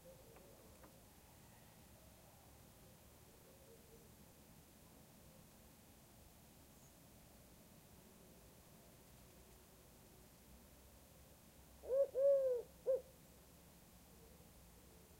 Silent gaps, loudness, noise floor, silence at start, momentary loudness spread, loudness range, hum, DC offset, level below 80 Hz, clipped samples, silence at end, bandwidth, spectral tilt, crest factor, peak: none; -39 LUFS; -65 dBFS; 0.05 s; 21 LU; 21 LU; none; under 0.1%; -72 dBFS; under 0.1%; 2.15 s; 16 kHz; -5 dB/octave; 20 dB; -28 dBFS